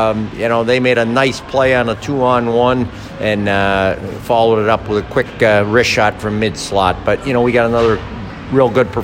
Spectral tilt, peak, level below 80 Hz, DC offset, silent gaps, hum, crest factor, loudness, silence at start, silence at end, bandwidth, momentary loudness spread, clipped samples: -5.5 dB/octave; 0 dBFS; -36 dBFS; under 0.1%; none; none; 14 dB; -14 LUFS; 0 s; 0 s; 16.5 kHz; 6 LU; under 0.1%